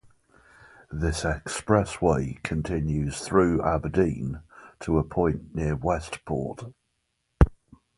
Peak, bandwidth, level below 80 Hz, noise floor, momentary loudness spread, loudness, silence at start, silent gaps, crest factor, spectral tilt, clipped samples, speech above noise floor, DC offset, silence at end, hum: 0 dBFS; 11.5 kHz; -36 dBFS; -76 dBFS; 11 LU; -26 LUFS; 0.9 s; none; 26 dB; -6.5 dB/octave; under 0.1%; 50 dB; under 0.1%; 0.45 s; none